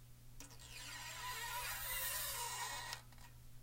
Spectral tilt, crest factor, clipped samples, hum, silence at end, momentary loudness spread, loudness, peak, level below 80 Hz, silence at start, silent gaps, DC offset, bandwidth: -0.5 dB/octave; 20 dB; under 0.1%; none; 0 s; 20 LU; -43 LUFS; -26 dBFS; -60 dBFS; 0 s; none; under 0.1%; 16 kHz